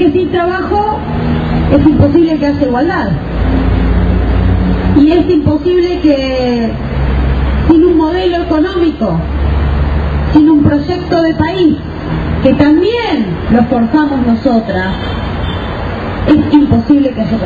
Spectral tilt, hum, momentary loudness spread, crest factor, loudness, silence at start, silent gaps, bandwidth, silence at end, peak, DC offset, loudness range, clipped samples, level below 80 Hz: -9 dB/octave; none; 8 LU; 10 dB; -11 LUFS; 0 s; none; 7 kHz; 0 s; 0 dBFS; under 0.1%; 1 LU; 0.2%; -18 dBFS